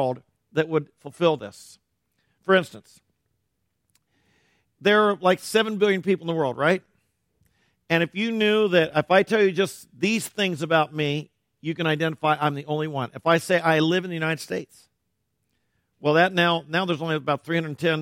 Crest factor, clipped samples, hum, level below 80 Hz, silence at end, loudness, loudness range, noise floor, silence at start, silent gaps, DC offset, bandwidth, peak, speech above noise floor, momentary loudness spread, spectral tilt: 20 dB; under 0.1%; none; -70 dBFS; 0 s; -23 LUFS; 5 LU; -76 dBFS; 0 s; none; under 0.1%; 16.5 kHz; -4 dBFS; 54 dB; 9 LU; -5.5 dB/octave